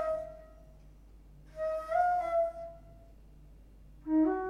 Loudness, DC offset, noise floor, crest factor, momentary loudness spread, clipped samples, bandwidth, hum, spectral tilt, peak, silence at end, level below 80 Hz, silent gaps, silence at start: -32 LUFS; under 0.1%; -55 dBFS; 16 dB; 21 LU; under 0.1%; 10.5 kHz; none; -7.5 dB/octave; -18 dBFS; 0 s; -56 dBFS; none; 0 s